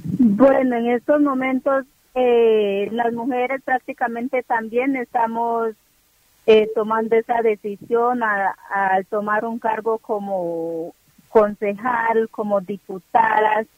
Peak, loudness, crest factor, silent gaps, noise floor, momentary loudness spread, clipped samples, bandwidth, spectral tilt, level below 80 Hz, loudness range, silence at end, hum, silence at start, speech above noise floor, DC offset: -2 dBFS; -20 LUFS; 18 dB; none; -59 dBFS; 9 LU; under 0.1%; 15.5 kHz; -7 dB/octave; -60 dBFS; 3 LU; 0.15 s; none; 0 s; 40 dB; under 0.1%